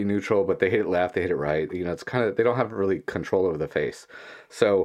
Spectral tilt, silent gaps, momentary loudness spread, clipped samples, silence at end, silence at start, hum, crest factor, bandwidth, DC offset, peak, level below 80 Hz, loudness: -6.5 dB/octave; none; 9 LU; under 0.1%; 0 s; 0 s; none; 20 dB; 12 kHz; under 0.1%; -4 dBFS; -58 dBFS; -25 LUFS